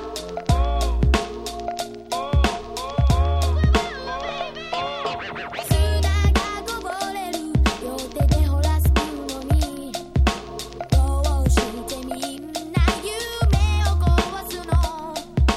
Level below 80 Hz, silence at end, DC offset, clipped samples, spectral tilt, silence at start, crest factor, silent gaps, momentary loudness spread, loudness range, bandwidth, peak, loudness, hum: -24 dBFS; 0 s; under 0.1%; under 0.1%; -5.5 dB/octave; 0 s; 16 dB; none; 10 LU; 2 LU; 15 kHz; -4 dBFS; -23 LUFS; none